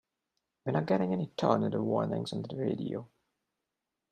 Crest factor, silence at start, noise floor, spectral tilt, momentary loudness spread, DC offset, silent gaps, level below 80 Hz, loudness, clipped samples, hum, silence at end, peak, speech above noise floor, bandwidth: 22 dB; 0.65 s; -87 dBFS; -7.5 dB/octave; 9 LU; under 0.1%; none; -72 dBFS; -32 LUFS; under 0.1%; none; 1.05 s; -10 dBFS; 56 dB; 9.8 kHz